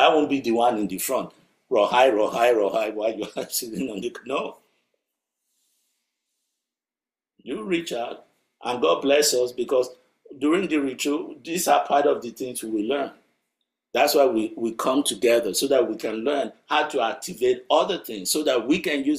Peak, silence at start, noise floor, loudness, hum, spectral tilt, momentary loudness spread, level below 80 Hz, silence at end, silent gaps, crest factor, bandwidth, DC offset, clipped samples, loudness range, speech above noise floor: -4 dBFS; 0 s; under -90 dBFS; -23 LUFS; none; -3 dB/octave; 11 LU; -68 dBFS; 0 s; none; 20 dB; 16 kHz; under 0.1%; under 0.1%; 12 LU; over 67 dB